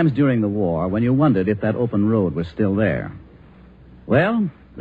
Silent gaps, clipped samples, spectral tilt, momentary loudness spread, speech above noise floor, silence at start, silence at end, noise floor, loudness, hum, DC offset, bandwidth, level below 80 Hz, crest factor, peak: none; under 0.1%; -10.5 dB/octave; 6 LU; 27 dB; 0 s; 0 s; -45 dBFS; -20 LUFS; none; under 0.1%; 4.9 kHz; -46 dBFS; 14 dB; -4 dBFS